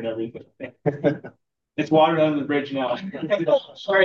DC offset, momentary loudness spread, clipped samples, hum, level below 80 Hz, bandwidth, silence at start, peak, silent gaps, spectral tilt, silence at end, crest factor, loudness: under 0.1%; 16 LU; under 0.1%; none; -72 dBFS; 7 kHz; 0 s; -6 dBFS; none; -7 dB/octave; 0 s; 16 dB; -23 LUFS